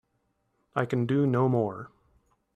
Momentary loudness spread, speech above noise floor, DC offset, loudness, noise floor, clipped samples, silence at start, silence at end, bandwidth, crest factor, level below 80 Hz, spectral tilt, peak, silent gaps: 15 LU; 49 dB; under 0.1%; -27 LUFS; -75 dBFS; under 0.1%; 0.75 s; 0.7 s; 8.2 kHz; 20 dB; -66 dBFS; -9 dB/octave; -10 dBFS; none